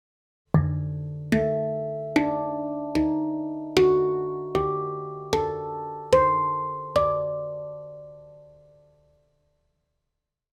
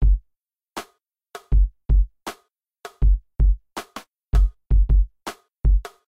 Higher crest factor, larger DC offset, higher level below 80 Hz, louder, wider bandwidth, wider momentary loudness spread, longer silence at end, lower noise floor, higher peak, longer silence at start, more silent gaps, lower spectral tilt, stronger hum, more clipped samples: first, 20 dB vs 12 dB; neither; second, -50 dBFS vs -20 dBFS; second, -26 LUFS vs -23 LUFS; first, 15 kHz vs 8.4 kHz; second, 14 LU vs 18 LU; first, 2.05 s vs 0.25 s; first, -82 dBFS vs -75 dBFS; about the same, -6 dBFS vs -8 dBFS; first, 0.55 s vs 0 s; neither; about the same, -7 dB/octave vs -6.5 dB/octave; neither; neither